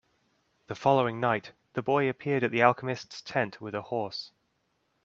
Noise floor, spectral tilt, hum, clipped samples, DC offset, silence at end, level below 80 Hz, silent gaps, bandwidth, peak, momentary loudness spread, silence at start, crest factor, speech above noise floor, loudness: -75 dBFS; -6.5 dB/octave; none; under 0.1%; under 0.1%; 0.75 s; -72 dBFS; none; 7.6 kHz; -4 dBFS; 13 LU; 0.7 s; 24 dB; 47 dB; -29 LUFS